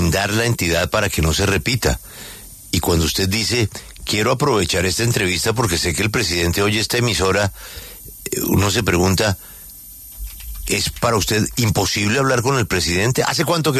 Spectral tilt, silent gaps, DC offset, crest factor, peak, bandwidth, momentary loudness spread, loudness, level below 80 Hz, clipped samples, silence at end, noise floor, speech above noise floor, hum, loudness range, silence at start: -4 dB/octave; none; under 0.1%; 16 dB; -2 dBFS; 14 kHz; 16 LU; -18 LUFS; -34 dBFS; under 0.1%; 0 s; -38 dBFS; 20 dB; none; 3 LU; 0 s